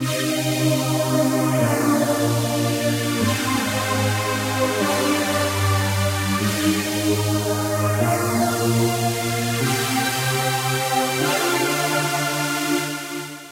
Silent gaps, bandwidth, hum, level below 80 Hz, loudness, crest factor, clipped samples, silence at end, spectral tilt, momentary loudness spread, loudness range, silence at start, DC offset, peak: none; 16 kHz; none; -54 dBFS; -20 LUFS; 14 dB; under 0.1%; 0 s; -4.5 dB/octave; 2 LU; 1 LU; 0 s; under 0.1%; -6 dBFS